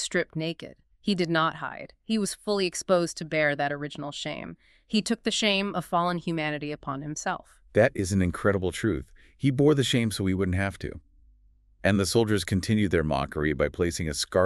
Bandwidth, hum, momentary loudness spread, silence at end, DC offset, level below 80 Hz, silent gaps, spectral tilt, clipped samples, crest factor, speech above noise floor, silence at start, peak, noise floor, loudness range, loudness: 13.5 kHz; none; 11 LU; 0 s; under 0.1%; -48 dBFS; none; -5 dB/octave; under 0.1%; 20 dB; 33 dB; 0 s; -6 dBFS; -60 dBFS; 3 LU; -27 LUFS